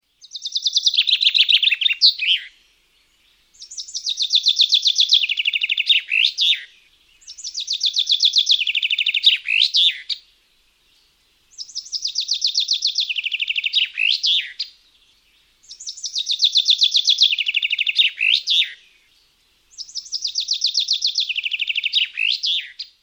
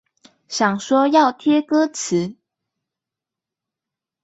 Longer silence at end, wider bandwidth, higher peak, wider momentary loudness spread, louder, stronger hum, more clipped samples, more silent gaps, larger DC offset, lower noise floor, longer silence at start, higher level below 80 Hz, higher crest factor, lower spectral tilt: second, 0.15 s vs 1.9 s; first, over 20 kHz vs 8.2 kHz; about the same, -2 dBFS vs -2 dBFS; first, 15 LU vs 8 LU; about the same, -16 LUFS vs -18 LUFS; neither; neither; neither; neither; second, -60 dBFS vs -87 dBFS; second, 0.35 s vs 0.5 s; about the same, -70 dBFS vs -68 dBFS; about the same, 18 dB vs 18 dB; second, 7 dB/octave vs -4.5 dB/octave